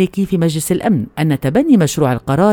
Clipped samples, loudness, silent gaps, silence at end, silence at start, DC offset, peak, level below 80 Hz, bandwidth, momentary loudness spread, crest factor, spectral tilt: under 0.1%; -15 LUFS; none; 0 s; 0 s; under 0.1%; 0 dBFS; -44 dBFS; 18.5 kHz; 5 LU; 14 dB; -6.5 dB/octave